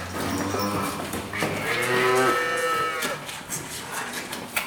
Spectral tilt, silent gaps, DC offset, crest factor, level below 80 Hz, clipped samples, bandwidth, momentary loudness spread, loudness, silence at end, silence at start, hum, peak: -3.5 dB/octave; none; under 0.1%; 18 dB; -56 dBFS; under 0.1%; 19.5 kHz; 10 LU; -25 LUFS; 0 s; 0 s; none; -8 dBFS